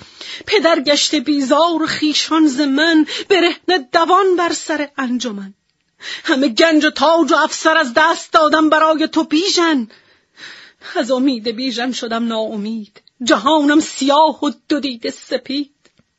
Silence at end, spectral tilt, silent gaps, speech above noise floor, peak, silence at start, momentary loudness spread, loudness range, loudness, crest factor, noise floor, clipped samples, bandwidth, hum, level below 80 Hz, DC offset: 0.55 s; -2.5 dB/octave; none; 25 dB; 0 dBFS; 0.2 s; 12 LU; 5 LU; -15 LUFS; 16 dB; -40 dBFS; under 0.1%; 8 kHz; none; -62 dBFS; under 0.1%